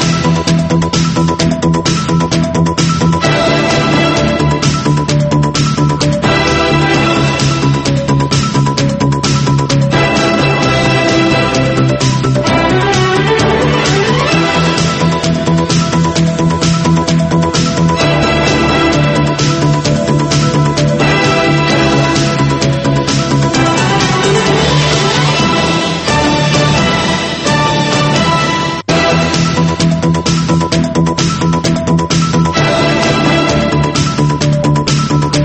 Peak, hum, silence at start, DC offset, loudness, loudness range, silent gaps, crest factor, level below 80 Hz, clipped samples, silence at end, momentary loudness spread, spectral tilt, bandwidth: 0 dBFS; none; 0 s; under 0.1%; -11 LUFS; 1 LU; none; 10 dB; -30 dBFS; under 0.1%; 0 s; 2 LU; -5 dB/octave; 8.8 kHz